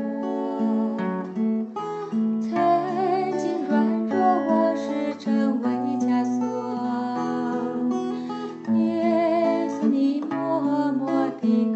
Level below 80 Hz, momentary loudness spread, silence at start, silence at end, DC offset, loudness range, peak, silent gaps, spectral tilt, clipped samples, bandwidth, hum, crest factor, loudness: -76 dBFS; 6 LU; 0 s; 0 s; under 0.1%; 2 LU; -8 dBFS; none; -7.5 dB/octave; under 0.1%; 8 kHz; none; 14 dB; -24 LUFS